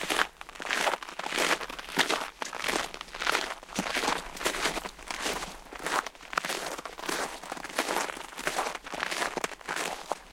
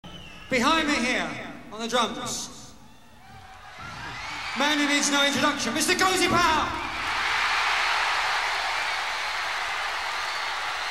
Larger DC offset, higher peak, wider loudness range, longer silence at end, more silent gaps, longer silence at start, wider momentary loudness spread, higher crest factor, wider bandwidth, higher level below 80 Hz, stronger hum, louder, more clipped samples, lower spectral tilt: second, under 0.1% vs 0.4%; about the same, -6 dBFS vs -8 dBFS; second, 3 LU vs 7 LU; about the same, 0 s vs 0 s; neither; about the same, 0 s vs 0.05 s; second, 8 LU vs 16 LU; first, 28 dB vs 18 dB; about the same, 17 kHz vs 16 kHz; about the same, -56 dBFS vs -52 dBFS; neither; second, -31 LUFS vs -24 LUFS; neither; about the same, -1 dB/octave vs -2 dB/octave